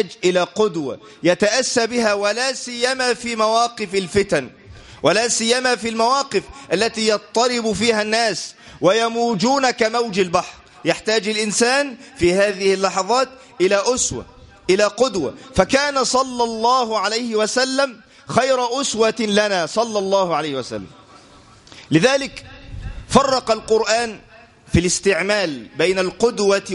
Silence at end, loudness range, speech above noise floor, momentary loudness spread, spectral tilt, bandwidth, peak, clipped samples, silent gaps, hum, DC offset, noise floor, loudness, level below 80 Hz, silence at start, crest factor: 0 s; 2 LU; 28 dB; 8 LU; -3.5 dB/octave; 11.5 kHz; 0 dBFS; under 0.1%; none; none; under 0.1%; -46 dBFS; -18 LUFS; -44 dBFS; 0 s; 20 dB